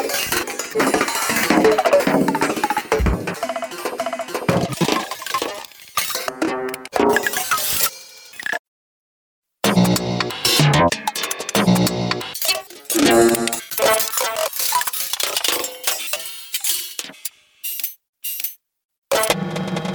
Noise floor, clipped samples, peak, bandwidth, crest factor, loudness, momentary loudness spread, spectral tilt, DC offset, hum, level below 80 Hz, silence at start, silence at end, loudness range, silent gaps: -40 dBFS; under 0.1%; -2 dBFS; over 20 kHz; 20 dB; -19 LUFS; 11 LU; -3.5 dB/octave; under 0.1%; none; -40 dBFS; 0 s; 0 s; 5 LU; 8.59-9.42 s, 18.09-18.13 s, 18.85-18.89 s, 18.98-19.02 s